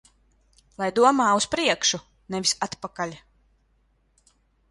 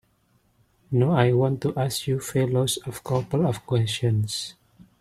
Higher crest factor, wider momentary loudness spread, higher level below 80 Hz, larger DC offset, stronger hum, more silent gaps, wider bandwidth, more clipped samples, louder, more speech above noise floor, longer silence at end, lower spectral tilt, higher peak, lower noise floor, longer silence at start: about the same, 20 dB vs 22 dB; first, 14 LU vs 8 LU; about the same, -60 dBFS vs -56 dBFS; neither; neither; neither; second, 11.5 kHz vs 15 kHz; neither; about the same, -23 LUFS vs -24 LUFS; about the same, 42 dB vs 42 dB; first, 1.5 s vs 0.5 s; second, -2.5 dB/octave vs -6 dB/octave; about the same, -6 dBFS vs -4 dBFS; about the same, -66 dBFS vs -65 dBFS; about the same, 0.8 s vs 0.9 s